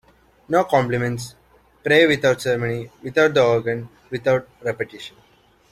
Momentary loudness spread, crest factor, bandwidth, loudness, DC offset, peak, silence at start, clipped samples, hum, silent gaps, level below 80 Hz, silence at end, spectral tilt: 15 LU; 18 dB; 14 kHz; -20 LUFS; under 0.1%; -2 dBFS; 0.5 s; under 0.1%; none; none; -54 dBFS; 0.6 s; -5.5 dB/octave